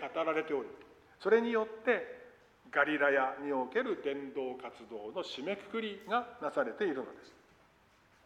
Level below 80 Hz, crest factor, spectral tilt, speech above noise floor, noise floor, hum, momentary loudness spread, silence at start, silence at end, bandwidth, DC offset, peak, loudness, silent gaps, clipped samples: -76 dBFS; 22 dB; -5 dB/octave; 32 dB; -66 dBFS; none; 17 LU; 0 s; 0.95 s; 9.4 kHz; under 0.1%; -14 dBFS; -34 LUFS; none; under 0.1%